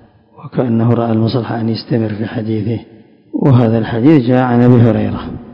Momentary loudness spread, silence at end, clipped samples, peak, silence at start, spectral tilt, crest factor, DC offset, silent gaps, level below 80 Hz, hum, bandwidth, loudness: 11 LU; 0 s; 0.9%; 0 dBFS; 0.4 s; -10.5 dB/octave; 12 dB; under 0.1%; none; -42 dBFS; none; 5.4 kHz; -13 LUFS